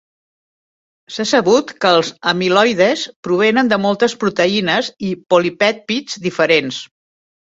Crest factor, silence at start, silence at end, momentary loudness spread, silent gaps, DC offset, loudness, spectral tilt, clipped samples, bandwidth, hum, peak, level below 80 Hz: 16 dB; 1.1 s; 0.6 s; 9 LU; 3.16-3.23 s; under 0.1%; -15 LUFS; -4 dB/octave; under 0.1%; 8 kHz; none; 0 dBFS; -60 dBFS